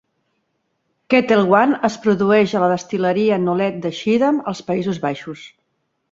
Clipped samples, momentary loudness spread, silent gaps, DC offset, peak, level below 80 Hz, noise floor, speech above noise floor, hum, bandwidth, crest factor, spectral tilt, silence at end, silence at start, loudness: under 0.1%; 9 LU; none; under 0.1%; -2 dBFS; -60 dBFS; -70 dBFS; 53 dB; none; 7.8 kHz; 18 dB; -6.5 dB/octave; 0.65 s; 1.1 s; -17 LUFS